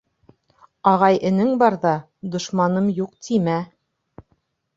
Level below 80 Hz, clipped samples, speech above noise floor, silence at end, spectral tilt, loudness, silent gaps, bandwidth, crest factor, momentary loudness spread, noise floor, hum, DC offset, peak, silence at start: -62 dBFS; under 0.1%; 48 dB; 1.1 s; -6.5 dB/octave; -20 LUFS; none; 7.8 kHz; 20 dB; 11 LU; -68 dBFS; none; under 0.1%; -2 dBFS; 0.85 s